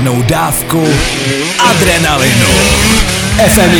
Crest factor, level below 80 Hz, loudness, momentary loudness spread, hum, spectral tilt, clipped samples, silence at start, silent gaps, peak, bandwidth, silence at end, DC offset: 10 dB; -22 dBFS; -9 LUFS; 4 LU; none; -3.5 dB/octave; 0.3%; 0 s; none; 0 dBFS; over 20 kHz; 0 s; under 0.1%